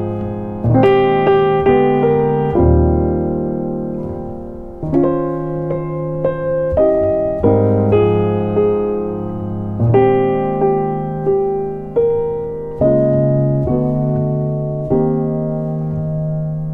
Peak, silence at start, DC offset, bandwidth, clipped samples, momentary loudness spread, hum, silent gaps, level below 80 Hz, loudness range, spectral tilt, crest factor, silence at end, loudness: -2 dBFS; 0 s; under 0.1%; 4.2 kHz; under 0.1%; 10 LU; none; none; -30 dBFS; 5 LU; -11 dB/octave; 14 dB; 0 s; -16 LUFS